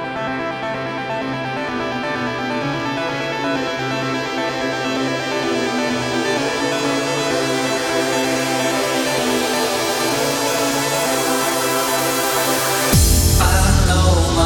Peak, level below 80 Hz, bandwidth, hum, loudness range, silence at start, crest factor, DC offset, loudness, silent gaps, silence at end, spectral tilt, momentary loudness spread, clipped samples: -2 dBFS; -28 dBFS; 19 kHz; none; 6 LU; 0 s; 16 dB; under 0.1%; -18 LUFS; none; 0 s; -4 dB/octave; 8 LU; under 0.1%